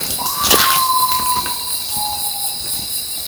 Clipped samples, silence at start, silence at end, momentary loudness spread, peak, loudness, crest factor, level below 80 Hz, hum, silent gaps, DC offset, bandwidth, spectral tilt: under 0.1%; 0 s; 0 s; 8 LU; 0 dBFS; -15 LUFS; 18 dB; -44 dBFS; none; none; under 0.1%; over 20 kHz; -0.5 dB/octave